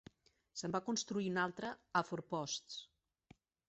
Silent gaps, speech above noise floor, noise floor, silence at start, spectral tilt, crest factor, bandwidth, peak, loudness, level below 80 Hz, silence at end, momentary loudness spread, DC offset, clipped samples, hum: none; 28 dB; -68 dBFS; 0.55 s; -3.5 dB/octave; 22 dB; 8.2 kHz; -20 dBFS; -41 LUFS; -78 dBFS; 0.85 s; 10 LU; under 0.1%; under 0.1%; none